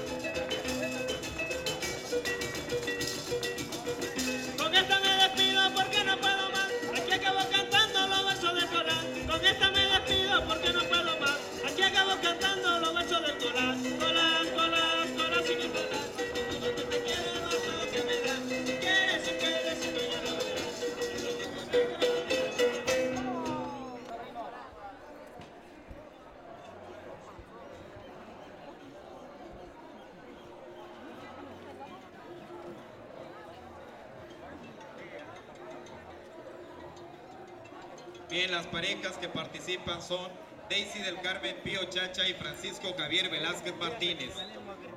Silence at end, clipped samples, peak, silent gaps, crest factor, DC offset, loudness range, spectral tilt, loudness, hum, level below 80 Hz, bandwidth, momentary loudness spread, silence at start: 0 s; under 0.1%; -12 dBFS; none; 22 dB; under 0.1%; 22 LU; -2 dB/octave; -29 LUFS; none; -58 dBFS; 16.5 kHz; 23 LU; 0 s